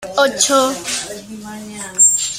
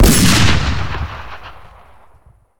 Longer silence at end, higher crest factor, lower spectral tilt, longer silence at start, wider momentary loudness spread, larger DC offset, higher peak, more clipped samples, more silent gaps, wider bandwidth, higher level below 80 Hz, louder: second, 0 s vs 1 s; about the same, 18 dB vs 14 dB; second, -0.5 dB/octave vs -4 dB/octave; about the same, 0 s vs 0 s; second, 20 LU vs 24 LU; neither; about the same, 0 dBFS vs 0 dBFS; neither; neither; second, 16 kHz vs 19.5 kHz; second, -54 dBFS vs -22 dBFS; about the same, -14 LUFS vs -14 LUFS